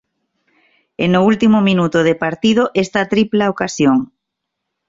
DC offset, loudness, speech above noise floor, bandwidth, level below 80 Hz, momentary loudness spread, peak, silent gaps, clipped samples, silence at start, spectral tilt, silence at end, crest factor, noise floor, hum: under 0.1%; -15 LUFS; 64 dB; 7.8 kHz; -52 dBFS; 6 LU; -2 dBFS; none; under 0.1%; 1 s; -6 dB/octave; 0.85 s; 14 dB; -77 dBFS; none